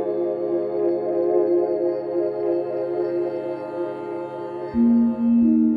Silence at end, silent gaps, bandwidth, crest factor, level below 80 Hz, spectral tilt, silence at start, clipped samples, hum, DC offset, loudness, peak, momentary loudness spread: 0 s; none; 4.8 kHz; 14 dB; -56 dBFS; -10.5 dB/octave; 0 s; under 0.1%; none; under 0.1%; -22 LUFS; -8 dBFS; 11 LU